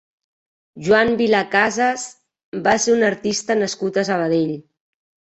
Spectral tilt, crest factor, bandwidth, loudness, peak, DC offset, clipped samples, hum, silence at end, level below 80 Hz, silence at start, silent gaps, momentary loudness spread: -4 dB/octave; 18 dB; 8.4 kHz; -18 LUFS; -2 dBFS; under 0.1%; under 0.1%; none; 0.8 s; -56 dBFS; 0.75 s; 2.44-2.52 s; 13 LU